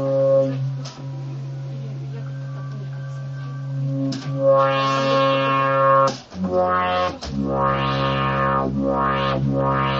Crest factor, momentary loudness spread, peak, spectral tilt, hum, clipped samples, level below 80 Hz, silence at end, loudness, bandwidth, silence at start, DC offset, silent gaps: 16 dB; 14 LU; -6 dBFS; -6.5 dB/octave; none; under 0.1%; -44 dBFS; 0 s; -21 LUFS; 7.6 kHz; 0 s; under 0.1%; none